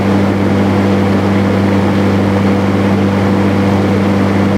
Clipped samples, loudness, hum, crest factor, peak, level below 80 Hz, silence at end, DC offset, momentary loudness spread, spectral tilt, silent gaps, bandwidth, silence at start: under 0.1%; -12 LUFS; none; 10 dB; 0 dBFS; -42 dBFS; 0 s; under 0.1%; 0 LU; -7.5 dB/octave; none; 12 kHz; 0 s